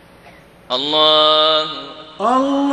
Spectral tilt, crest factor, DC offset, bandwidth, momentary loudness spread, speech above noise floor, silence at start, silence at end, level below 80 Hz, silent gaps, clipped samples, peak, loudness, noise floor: -4 dB/octave; 16 dB; under 0.1%; 9.8 kHz; 14 LU; 29 dB; 0.7 s; 0 s; -58 dBFS; none; under 0.1%; 0 dBFS; -14 LUFS; -44 dBFS